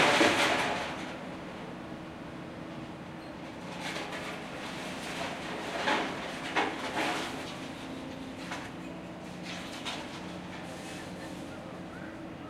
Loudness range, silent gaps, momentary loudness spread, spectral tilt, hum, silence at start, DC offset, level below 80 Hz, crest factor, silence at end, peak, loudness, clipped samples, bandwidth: 7 LU; none; 13 LU; -3.5 dB/octave; none; 0 s; under 0.1%; -62 dBFS; 24 dB; 0 s; -12 dBFS; -35 LUFS; under 0.1%; 16.5 kHz